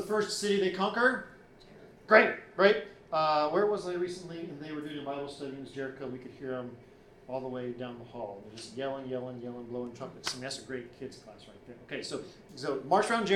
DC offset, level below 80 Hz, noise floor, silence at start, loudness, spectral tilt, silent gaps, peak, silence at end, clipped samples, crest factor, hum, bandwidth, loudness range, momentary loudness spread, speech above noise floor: under 0.1%; -66 dBFS; -54 dBFS; 0 s; -32 LUFS; -4 dB/octave; none; -6 dBFS; 0 s; under 0.1%; 26 dB; none; 14 kHz; 13 LU; 18 LU; 23 dB